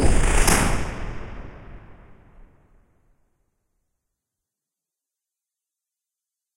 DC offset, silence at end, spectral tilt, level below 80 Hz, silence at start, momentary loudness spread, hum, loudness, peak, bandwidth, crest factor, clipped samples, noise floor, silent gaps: under 0.1%; 4.75 s; -4 dB/octave; -28 dBFS; 0 s; 25 LU; none; -22 LUFS; -2 dBFS; 16 kHz; 22 dB; under 0.1%; -87 dBFS; none